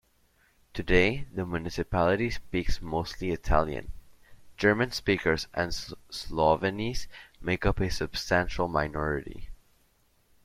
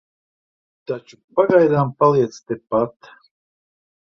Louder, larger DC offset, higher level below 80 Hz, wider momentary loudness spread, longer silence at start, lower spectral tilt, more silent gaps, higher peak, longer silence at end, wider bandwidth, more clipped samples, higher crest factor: second, -29 LUFS vs -18 LUFS; neither; first, -40 dBFS vs -60 dBFS; about the same, 14 LU vs 15 LU; second, 0.75 s vs 0.9 s; second, -5.5 dB/octave vs -8 dB/octave; second, none vs 1.24-1.28 s; second, -6 dBFS vs -2 dBFS; second, 0.9 s vs 1.25 s; first, 15 kHz vs 7.2 kHz; neither; about the same, 22 dB vs 18 dB